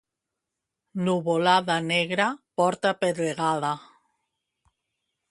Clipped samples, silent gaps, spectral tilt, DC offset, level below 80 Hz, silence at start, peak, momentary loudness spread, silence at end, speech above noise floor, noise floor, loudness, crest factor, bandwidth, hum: under 0.1%; none; -5 dB/octave; under 0.1%; -72 dBFS; 0.95 s; -6 dBFS; 8 LU; 1.5 s; 61 dB; -85 dBFS; -24 LUFS; 22 dB; 11.5 kHz; none